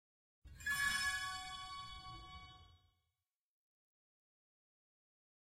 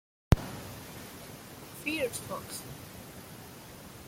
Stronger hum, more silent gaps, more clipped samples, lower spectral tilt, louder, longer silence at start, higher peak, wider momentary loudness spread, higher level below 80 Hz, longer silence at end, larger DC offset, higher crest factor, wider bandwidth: neither; neither; neither; second, 0 dB/octave vs -5 dB/octave; second, -40 LUFS vs -36 LUFS; first, 0.45 s vs 0.3 s; second, -26 dBFS vs -8 dBFS; about the same, 19 LU vs 18 LU; second, -64 dBFS vs -44 dBFS; first, 2.7 s vs 0 s; neither; second, 20 dB vs 28 dB; about the same, 16 kHz vs 16.5 kHz